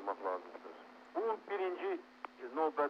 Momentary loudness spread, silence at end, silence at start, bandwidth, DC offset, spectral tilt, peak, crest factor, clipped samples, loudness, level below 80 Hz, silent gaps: 14 LU; 0 s; 0 s; 7.2 kHz; under 0.1%; -5 dB/octave; -22 dBFS; 18 dB; under 0.1%; -40 LUFS; -90 dBFS; none